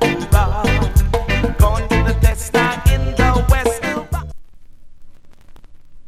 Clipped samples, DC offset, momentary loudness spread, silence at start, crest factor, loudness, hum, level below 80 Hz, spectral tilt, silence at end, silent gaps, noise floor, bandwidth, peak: under 0.1%; under 0.1%; 7 LU; 0 s; 16 dB; -17 LUFS; none; -20 dBFS; -5.5 dB/octave; 0 s; none; -36 dBFS; 15.5 kHz; 0 dBFS